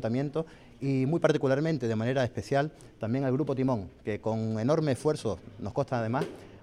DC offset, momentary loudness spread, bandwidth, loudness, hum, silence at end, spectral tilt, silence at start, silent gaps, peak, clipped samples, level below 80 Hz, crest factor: under 0.1%; 10 LU; 12 kHz; -30 LUFS; none; 0.05 s; -7.5 dB/octave; 0 s; none; -12 dBFS; under 0.1%; -60 dBFS; 18 dB